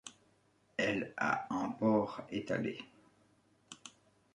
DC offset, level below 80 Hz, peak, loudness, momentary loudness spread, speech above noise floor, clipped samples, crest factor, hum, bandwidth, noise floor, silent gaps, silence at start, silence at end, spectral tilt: under 0.1%; -74 dBFS; -18 dBFS; -36 LUFS; 21 LU; 36 dB; under 0.1%; 20 dB; 50 Hz at -65 dBFS; 11 kHz; -72 dBFS; none; 0.05 s; 0.45 s; -5.5 dB/octave